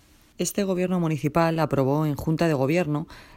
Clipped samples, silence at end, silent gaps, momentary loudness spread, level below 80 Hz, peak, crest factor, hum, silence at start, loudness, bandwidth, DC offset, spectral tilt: under 0.1%; 0.15 s; none; 6 LU; -50 dBFS; -8 dBFS; 16 dB; none; 0.4 s; -24 LUFS; 16 kHz; under 0.1%; -6.5 dB/octave